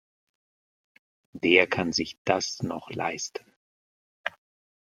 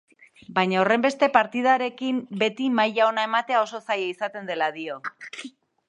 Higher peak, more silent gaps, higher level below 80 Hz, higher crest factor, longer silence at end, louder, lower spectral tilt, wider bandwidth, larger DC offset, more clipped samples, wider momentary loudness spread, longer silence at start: about the same, -2 dBFS vs 0 dBFS; first, 2.18-2.25 s, 3.56-4.24 s vs none; first, -66 dBFS vs -76 dBFS; about the same, 28 dB vs 24 dB; first, 0.7 s vs 0.4 s; second, -27 LUFS vs -23 LUFS; second, -3.5 dB/octave vs -5 dB/octave; first, 13.5 kHz vs 10.5 kHz; neither; neither; about the same, 16 LU vs 14 LU; first, 1.35 s vs 0.5 s